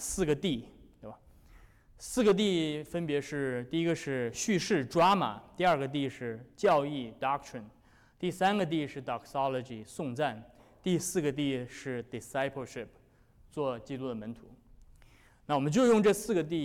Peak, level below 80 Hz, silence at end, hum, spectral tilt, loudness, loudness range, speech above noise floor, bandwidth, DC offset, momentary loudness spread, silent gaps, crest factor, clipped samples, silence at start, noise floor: -18 dBFS; -60 dBFS; 0 s; none; -5 dB/octave; -31 LUFS; 7 LU; 30 dB; 17 kHz; under 0.1%; 17 LU; none; 14 dB; under 0.1%; 0 s; -61 dBFS